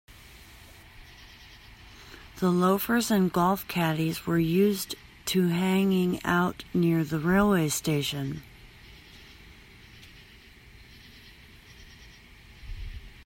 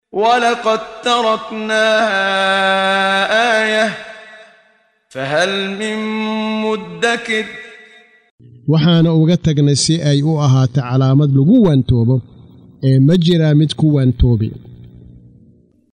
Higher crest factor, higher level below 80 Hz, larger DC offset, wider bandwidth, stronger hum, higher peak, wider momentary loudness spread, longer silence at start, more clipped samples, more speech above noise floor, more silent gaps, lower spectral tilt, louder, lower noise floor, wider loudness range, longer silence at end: about the same, 18 dB vs 14 dB; second, -50 dBFS vs -34 dBFS; neither; first, 16.5 kHz vs 10.5 kHz; neither; second, -10 dBFS vs -2 dBFS; first, 25 LU vs 8 LU; first, 0.35 s vs 0.15 s; neither; second, 27 dB vs 42 dB; second, none vs 8.31-8.38 s; about the same, -5.5 dB/octave vs -6 dB/octave; second, -26 LUFS vs -14 LUFS; about the same, -52 dBFS vs -55 dBFS; first, 10 LU vs 6 LU; second, 0.05 s vs 1.05 s